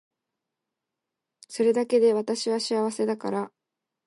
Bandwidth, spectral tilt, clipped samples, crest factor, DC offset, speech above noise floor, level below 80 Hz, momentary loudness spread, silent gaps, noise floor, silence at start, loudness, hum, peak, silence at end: 11.5 kHz; -4.5 dB/octave; under 0.1%; 16 dB; under 0.1%; 62 dB; -82 dBFS; 11 LU; none; -86 dBFS; 1.5 s; -25 LUFS; none; -12 dBFS; 0.6 s